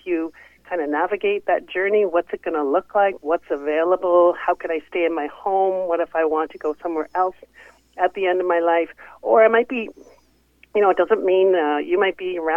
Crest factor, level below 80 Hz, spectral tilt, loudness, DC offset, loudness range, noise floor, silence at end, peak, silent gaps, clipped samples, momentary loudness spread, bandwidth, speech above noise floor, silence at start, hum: 16 dB; -62 dBFS; -6.5 dB/octave; -20 LUFS; under 0.1%; 3 LU; -58 dBFS; 0 s; -4 dBFS; none; under 0.1%; 9 LU; 5.4 kHz; 38 dB; 0.05 s; none